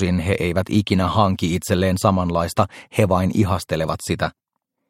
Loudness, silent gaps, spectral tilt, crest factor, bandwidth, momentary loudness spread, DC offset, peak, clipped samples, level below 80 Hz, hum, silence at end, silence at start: -20 LUFS; none; -6 dB/octave; 18 dB; 16.5 kHz; 5 LU; under 0.1%; -2 dBFS; under 0.1%; -42 dBFS; none; 0.6 s; 0 s